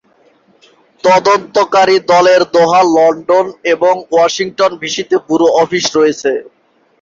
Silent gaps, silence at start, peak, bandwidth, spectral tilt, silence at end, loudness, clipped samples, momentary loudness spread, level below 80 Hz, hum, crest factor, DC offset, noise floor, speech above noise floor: none; 1.05 s; 0 dBFS; 7.8 kHz; -3.5 dB/octave; 0.6 s; -11 LUFS; under 0.1%; 7 LU; -56 dBFS; none; 10 dB; under 0.1%; -51 dBFS; 40 dB